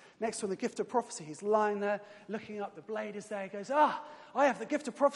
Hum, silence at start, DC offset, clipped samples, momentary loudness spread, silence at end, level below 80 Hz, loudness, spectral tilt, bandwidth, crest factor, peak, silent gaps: none; 0.2 s; under 0.1%; under 0.1%; 13 LU; 0 s; -86 dBFS; -34 LUFS; -4.5 dB/octave; 11.5 kHz; 18 dB; -14 dBFS; none